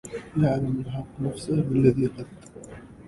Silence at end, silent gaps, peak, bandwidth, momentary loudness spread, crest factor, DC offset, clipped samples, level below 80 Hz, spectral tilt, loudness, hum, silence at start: 0 s; none; -6 dBFS; 11.5 kHz; 22 LU; 20 dB; under 0.1%; under 0.1%; -50 dBFS; -8 dB/octave; -25 LUFS; none; 0.05 s